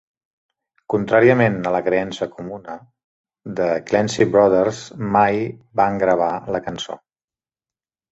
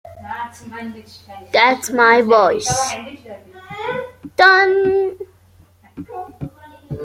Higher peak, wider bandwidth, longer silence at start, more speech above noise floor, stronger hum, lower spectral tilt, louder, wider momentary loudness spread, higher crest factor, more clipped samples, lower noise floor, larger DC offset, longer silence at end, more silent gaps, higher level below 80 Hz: about the same, -2 dBFS vs -2 dBFS; second, 8 kHz vs 16 kHz; first, 0.9 s vs 0.05 s; first, over 72 dB vs 34 dB; neither; first, -6 dB/octave vs -3 dB/octave; second, -19 LUFS vs -15 LUFS; second, 17 LU vs 23 LU; about the same, 18 dB vs 18 dB; neither; first, under -90 dBFS vs -50 dBFS; neither; first, 1.15 s vs 0 s; first, 3.04-3.24 s vs none; about the same, -54 dBFS vs -52 dBFS